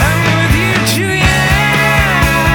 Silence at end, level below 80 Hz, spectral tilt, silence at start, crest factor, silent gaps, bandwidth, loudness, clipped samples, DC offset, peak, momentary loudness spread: 0 s; -22 dBFS; -4.5 dB/octave; 0 s; 10 dB; none; over 20 kHz; -10 LUFS; under 0.1%; under 0.1%; 0 dBFS; 2 LU